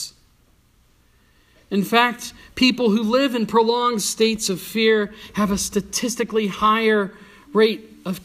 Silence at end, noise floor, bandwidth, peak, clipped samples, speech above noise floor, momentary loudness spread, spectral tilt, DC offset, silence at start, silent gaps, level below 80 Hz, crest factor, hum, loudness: 0.05 s; -58 dBFS; 15.5 kHz; -2 dBFS; under 0.1%; 38 dB; 9 LU; -3.5 dB/octave; under 0.1%; 0 s; none; -50 dBFS; 20 dB; none; -20 LUFS